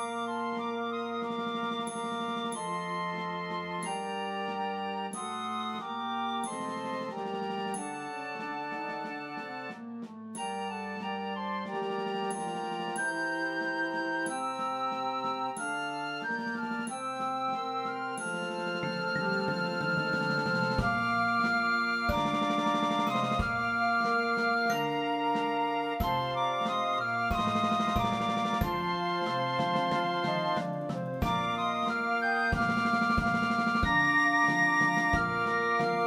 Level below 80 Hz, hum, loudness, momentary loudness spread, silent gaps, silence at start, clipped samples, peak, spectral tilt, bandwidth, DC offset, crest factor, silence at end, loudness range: -50 dBFS; none; -31 LUFS; 8 LU; none; 0 s; under 0.1%; -14 dBFS; -5 dB/octave; 16 kHz; under 0.1%; 18 dB; 0 s; 8 LU